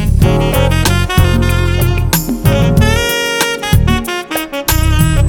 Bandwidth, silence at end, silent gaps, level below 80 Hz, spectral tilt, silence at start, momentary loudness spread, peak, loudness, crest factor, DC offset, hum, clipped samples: over 20 kHz; 0 s; none; -18 dBFS; -5 dB/octave; 0 s; 4 LU; 0 dBFS; -12 LUFS; 12 dB; under 0.1%; none; under 0.1%